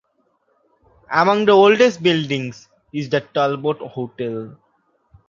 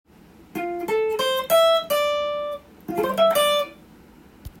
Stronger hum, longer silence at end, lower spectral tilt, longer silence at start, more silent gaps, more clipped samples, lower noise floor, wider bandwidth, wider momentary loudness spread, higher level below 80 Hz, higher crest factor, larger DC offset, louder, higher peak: neither; first, 0.8 s vs 0.1 s; first, -5.5 dB/octave vs -2.5 dB/octave; first, 1.1 s vs 0.55 s; neither; neither; first, -65 dBFS vs -49 dBFS; second, 7.4 kHz vs 16.5 kHz; first, 18 LU vs 14 LU; second, -62 dBFS vs -54 dBFS; about the same, 18 dB vs 16 dB; neither; first, -18 LUFS vs -22 LUFS; first, -2 dBFS vs -8 dBFS